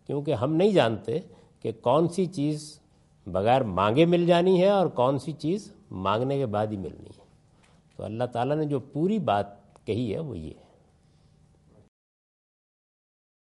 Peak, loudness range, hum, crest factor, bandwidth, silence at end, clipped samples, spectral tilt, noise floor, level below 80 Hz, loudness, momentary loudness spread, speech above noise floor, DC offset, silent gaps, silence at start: -8 dBFS; 10 LU; none; 20 dB; 11.5 kHz; 2.9 s; under 0.1%; -7 dB/octave; -60 dBFS; -62 dBFS; -26 LUFS; 16 LU; 35 dB; under 0.1%; none; 0.1 s